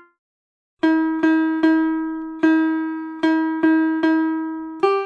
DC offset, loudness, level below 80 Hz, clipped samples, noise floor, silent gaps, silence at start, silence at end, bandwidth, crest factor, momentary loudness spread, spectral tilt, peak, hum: under 0.1%; -20 LUFS; -62 dBFS; under 0.1%; under -90 dBFS; none; 0.85 s; 0 s; 5.4 kHz; 14 dB; 7 LU; -5.5 dB/octave; -4 dBFS; none